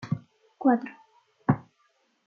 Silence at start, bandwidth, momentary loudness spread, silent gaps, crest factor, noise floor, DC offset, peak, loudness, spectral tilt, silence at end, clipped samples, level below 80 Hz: 0 s; 6.4 kHz; 10 LU; none; 22 dB; -69 dBFS; under 0.1%; -8 dBFS; -28 LUFS; -10 dB/octave; 0.65 s; under 0.1%; -64 dBFS